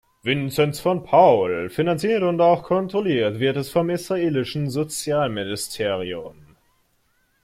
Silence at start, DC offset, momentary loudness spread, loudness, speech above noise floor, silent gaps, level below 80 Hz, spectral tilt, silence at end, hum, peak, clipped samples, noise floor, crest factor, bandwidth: 0.25 s; under 0.1%; 9 LU; -21 LUFS; 45 dB; none; -56 dBFS; -5.5 dB/octave; 1.1 s; none; -4 dBFS; under 0.1%; -65 dBFS; 18 dB; 16 kHz